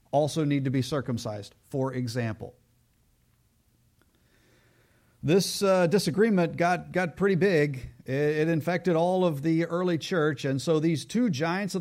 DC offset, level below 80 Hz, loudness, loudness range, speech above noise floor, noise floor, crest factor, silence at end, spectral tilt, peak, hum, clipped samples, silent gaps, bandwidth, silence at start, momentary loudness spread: under 0.1%; -60 dBFS; -26 LUFS; 12 LU; 41 dB; -66 dBFS; 16 dB; 0 s; -6 dB/octave; -12 dBFS; none; under 0.1%; none; 16 kHz; 0.15 s; 10 LU